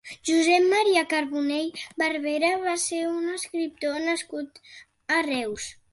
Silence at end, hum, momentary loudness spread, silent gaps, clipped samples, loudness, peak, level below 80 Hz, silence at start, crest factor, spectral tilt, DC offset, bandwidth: 0.2 s; none; 13 LU; none; under 0.1%; -25 LUFS; -8 dBFS; -66 dBFS; 0.05 s; 18 dB; -1.5 dB/octave; under 0.1%; 11.5 kHz